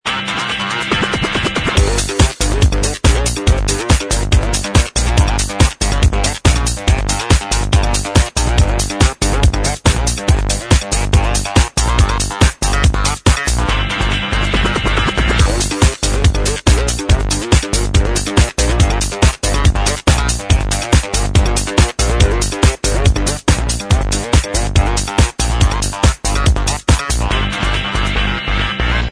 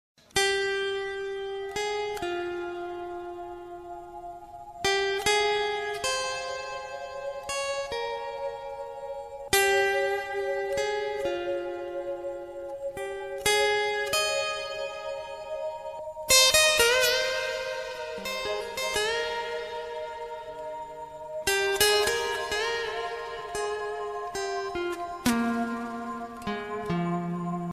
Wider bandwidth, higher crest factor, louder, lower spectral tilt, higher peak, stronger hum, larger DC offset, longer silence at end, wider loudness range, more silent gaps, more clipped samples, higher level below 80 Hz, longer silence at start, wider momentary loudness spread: second, 11 kHz vs 15.5 kHz; second, 14 dB vs 22 dB; first, -15 LUFS vs -28 LUFS; first, -4 dB/octave vs -2 dB/octave; first, 0 dBFS vs -8 dBFS; neither; neither; about the same, 0 s vs 0 s; second, 1 LU vs 9 LU; neither; neither; first, -16 dBFS vs -56 dBFS; second, 0.05 s vs 0.35 s; second, 2 LU vs 15 LU